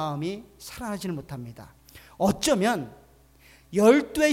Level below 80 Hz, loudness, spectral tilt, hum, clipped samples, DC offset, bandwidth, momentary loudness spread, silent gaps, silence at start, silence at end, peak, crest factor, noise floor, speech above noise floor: -54 dBFS; -25 LUFS; -5 dB/octave; none; under 0.1%; under 0.1%; 19 kHz; 20 LU; none; 0 s; 0 s; -6 dBFS; 20 dB; -56 dBFS; 31 dB